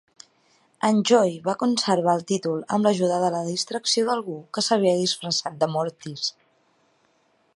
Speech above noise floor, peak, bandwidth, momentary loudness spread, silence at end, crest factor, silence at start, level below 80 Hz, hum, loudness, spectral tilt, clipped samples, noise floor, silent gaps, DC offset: 42 dB; -4 dBFS; 11.5 kHz; 9 LU; 1.25 s; 20 dB; 0.85 s; -74 dBFS; none; -23 LUFS; -4 dB/octave; under 0.1%; -65 dBFS; none; under 0.1%